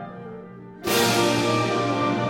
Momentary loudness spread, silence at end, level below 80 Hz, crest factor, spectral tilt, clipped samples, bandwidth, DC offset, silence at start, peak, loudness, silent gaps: 20 LU; 0 s; -56 dBFS; 16 dB; -4 dB/octave; under 0.1%; 16.5 kHz; under 0.1%; 0 s; -8 dBFS; -22 LUFS; none